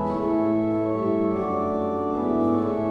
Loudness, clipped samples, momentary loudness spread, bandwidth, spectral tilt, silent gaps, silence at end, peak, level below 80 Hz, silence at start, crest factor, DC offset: -24 LUFS; under 0.1%; 3 LU; 5.8 kHz; -10 dB/octave; none; 0 s; -10 dBFS; -54 dBFS; 0 s; 12 dB; under 0.1%